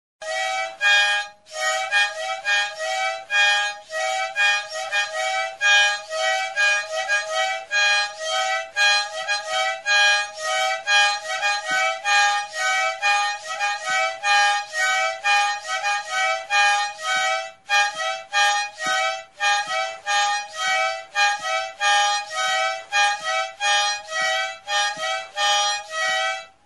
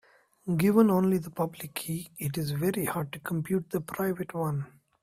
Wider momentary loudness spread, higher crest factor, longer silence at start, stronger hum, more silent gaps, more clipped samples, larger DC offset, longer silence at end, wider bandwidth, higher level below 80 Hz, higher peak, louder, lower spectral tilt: second, 7 LU vs 13 LU; about the same, 18 dB vs 20 dB; second, 0.2 s vs 0.45 s; neither; neither; neither; first, 0.1% vs under 0.1%; second, 0.2 s vs 0.35 s; second, 11.5 kHz vs 16 kHz; second, -72 dBFS vs -64 dBFS; first, -4 dBFS vs -8 dBFS; first, -20 LUFS vs -29 LUFS; second, 3 dB/octave vs -6.5 dB/octave